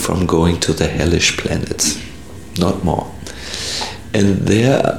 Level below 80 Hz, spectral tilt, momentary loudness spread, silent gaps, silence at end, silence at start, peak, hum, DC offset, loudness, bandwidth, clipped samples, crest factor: -34 dBFS; -4.5 dB/octave; 13 LU; none; 0 s; 0 s; 0 dBFS; none; 1%; -17 LUFS; 17.5 kHz; under 0.1%; 16 dB